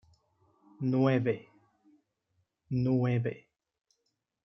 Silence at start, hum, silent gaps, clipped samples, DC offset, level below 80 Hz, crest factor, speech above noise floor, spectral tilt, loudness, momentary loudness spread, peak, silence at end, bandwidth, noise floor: 0.8 s; none; none; under 0.1%; under 0.1%; -70 dBFS; 20 dB; 53 dB; -10 dB/octave; -30 LUFS; 11 LU; -14 dBFS; 1.05 s; 6 kHz; -82 dBFS